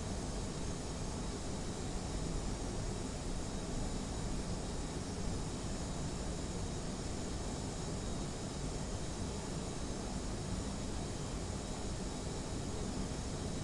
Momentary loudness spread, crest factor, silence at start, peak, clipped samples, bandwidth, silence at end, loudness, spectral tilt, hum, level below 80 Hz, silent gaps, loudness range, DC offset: 1 LU; 14 dB; 0 s; -24 dBFS; under 0.1%; 11.5 kHz; 0 s; -41 LUFS; -5 dB/octave; none; -44 dBFS; none; 0 LU; under 0.1%